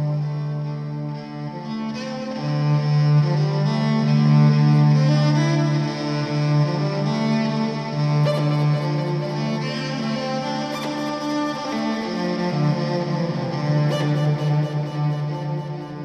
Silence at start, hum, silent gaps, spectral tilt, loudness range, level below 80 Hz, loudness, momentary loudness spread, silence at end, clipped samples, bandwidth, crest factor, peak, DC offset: 0 s; none; none; -7.5 dB/octave; 6 LU; -60 dBFS; -21 LUFS; 11 LU; 0 s; under 0.1%; 6.8 kHz; 14 dB; -6 dBFS; under 0.1%